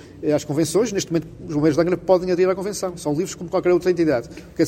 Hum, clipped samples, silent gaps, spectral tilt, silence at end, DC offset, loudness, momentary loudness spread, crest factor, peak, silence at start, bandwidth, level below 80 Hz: none; under 0.1%; none; -5.5 dB/octave; 0 s; under 0.1%; -21 LUFS; 7 LU; 18 dB; -2 dBFS; 0.05 s; 16.5 kHz; -50 dBFS